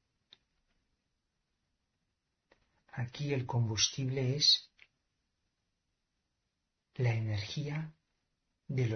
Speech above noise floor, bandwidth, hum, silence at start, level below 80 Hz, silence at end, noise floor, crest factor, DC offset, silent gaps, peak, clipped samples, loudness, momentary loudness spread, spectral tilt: 52 dB; 6.4 kHz; none; 2.95 s; -68 dBFS; 0 s; -85 dBFS; 22 dB; under 0.1%; none; -16 dBFS; under 0.1%; -32 LUFS; 16 LU; -4 dB/octave